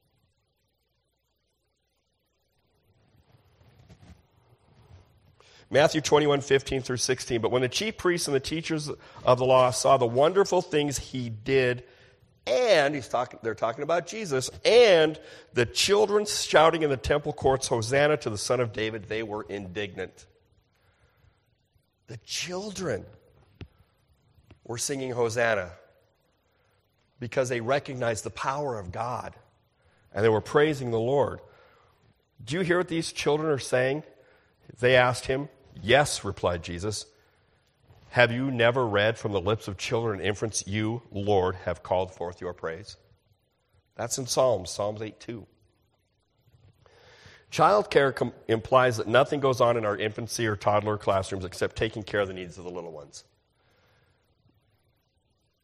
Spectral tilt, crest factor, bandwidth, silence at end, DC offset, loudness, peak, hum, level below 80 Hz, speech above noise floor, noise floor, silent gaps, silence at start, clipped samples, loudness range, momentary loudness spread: -4 dB/octave; 24 dB; 14 kHz; 2.45 s; under 0.1%; -26 LUFS; -4 dBFS; none; -56 dBFS; 50 dB; -75 dBFS; none; 3.9 s; under 0.1%; 11 LU; 14 LU